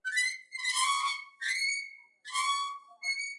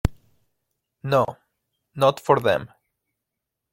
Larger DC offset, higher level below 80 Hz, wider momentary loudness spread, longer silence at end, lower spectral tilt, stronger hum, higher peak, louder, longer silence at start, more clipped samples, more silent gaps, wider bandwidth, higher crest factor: neither; second, under -90 dBFS vs -40 dBFS; second, 9 LU vs 13 LU; second, 0 s vs 1.05 s; second, 8 dB/octave vs -6 dB/octave; neither; second, -18 dBFS vs -4 dBFS; second, -31 LUFS vs -22 LUFS; about the same, 0.05 s vs 0.05 s; neither; neither; second, 11.5 kHz vs 16.5 kHz; second, 16 dB vs 22 dB